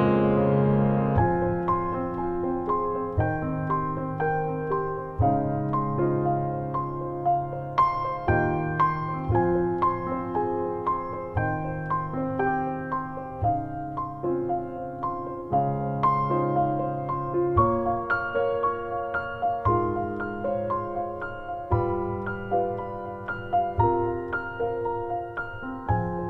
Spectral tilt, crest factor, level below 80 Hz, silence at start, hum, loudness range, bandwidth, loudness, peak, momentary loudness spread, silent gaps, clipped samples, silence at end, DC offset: -10.5 dB/octave; 18 dB; -44 dBFS; 0 s; none; 4 LU; 5.8 kHz; -27 LUFS; -8 dBFS; 8 LU; none; under 0.1%; 0 s; under 0.1%